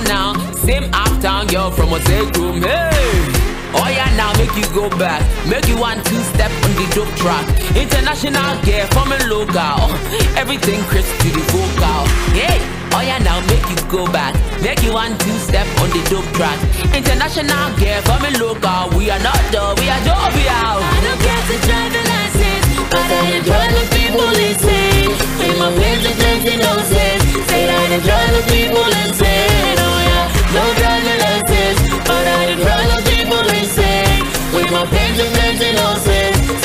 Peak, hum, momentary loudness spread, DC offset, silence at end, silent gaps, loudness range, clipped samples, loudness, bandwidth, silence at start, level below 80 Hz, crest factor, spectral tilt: -2 dBFS; none; 4 LU; under 0.1%; 0 s; none; 3 LU; under 0.1%; -14 LUFS; 16 kHz; 0 s; -20 dBFS; 12 dB; -4 dB/octave